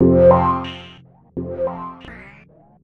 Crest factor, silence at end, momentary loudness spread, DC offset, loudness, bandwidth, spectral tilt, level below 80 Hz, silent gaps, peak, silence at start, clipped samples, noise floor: 18 dB; 0.6 s; 26 LU; under 0.1%; -17 LUFS; 4.5 kHz; -10 dB/octave; -42 dBFS; none; -2 dBFS; 0 s; under 0.1%; -48 dBFS